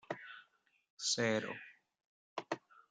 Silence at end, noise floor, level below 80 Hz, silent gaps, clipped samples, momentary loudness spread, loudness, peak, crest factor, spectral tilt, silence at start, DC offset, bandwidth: 0.1 s; -71 dBFS; -86 dBFS; 0.90-0.97 s, 2.05-2.36 s; under 0.1%; 20 LU; -39 LUFS; -20 dBFS; 22 dB; -2.5 dB/octave; 0.1 s; under 0.1%; 10.5 kHz